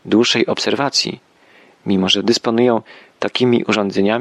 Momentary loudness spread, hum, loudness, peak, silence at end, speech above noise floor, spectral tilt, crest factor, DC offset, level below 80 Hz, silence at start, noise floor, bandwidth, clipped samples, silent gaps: 9 LU; none; -16 LUFS; -2 dBFS; 0 s; 33 dB; -4 dB/octave; 16 dB; under 0.1%; -62 dBFS; 0.05 s; -49 dBFS; 12 kHz; under 0.1%; none